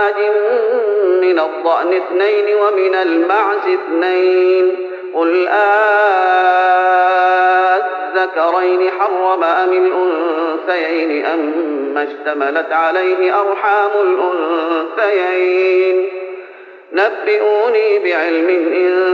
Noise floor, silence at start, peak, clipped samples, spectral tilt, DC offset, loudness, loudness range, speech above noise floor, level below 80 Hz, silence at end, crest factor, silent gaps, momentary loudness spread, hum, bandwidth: -36 dBFS; 0 s; 0 dBFS; under 0.1%; 1.5 dB/octave; under 0.1%; -14 LUFS; 4 LU; 23 dB; -82 dBFS; 0 s; 12 dB; none; 6 LU; none; 5.4 kHz